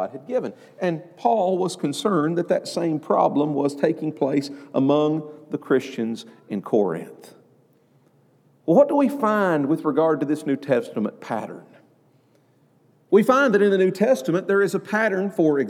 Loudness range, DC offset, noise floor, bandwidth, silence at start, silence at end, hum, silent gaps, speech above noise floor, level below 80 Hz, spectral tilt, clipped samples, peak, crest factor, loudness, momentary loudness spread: 5 LU; under 0.1%; -60 dBFS; 15 kHz; 0 s; 0 s; none; none; 38 dB; -82 dBFS; -6.5 dB/octave; under 0.1%; -4 dBFS; 18 dB; -22 LUFS; 12 LU